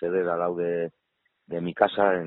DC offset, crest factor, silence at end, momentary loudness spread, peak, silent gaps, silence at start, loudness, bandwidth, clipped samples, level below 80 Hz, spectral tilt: under 0.1%; 22 dB; 0 s; 12 LU; -4 dBFS; none; 0 s; -26 LUFS; 4.2 kHz; under 0.1%; -66 dBFS; -9.5 dB/octave